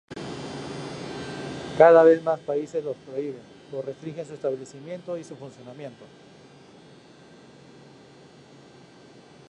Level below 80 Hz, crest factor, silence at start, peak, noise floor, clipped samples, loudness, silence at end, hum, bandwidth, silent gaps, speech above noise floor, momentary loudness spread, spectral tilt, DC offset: -64 dBFS; 24 dB; 0.1 s; -2 dBFS; -50 dBFS; under 0.1%; -24 LUFS; 3.45 s; none; 9.8 kHz; none; 27 dB; 25 LU; -6 dB/octave; under 0.1%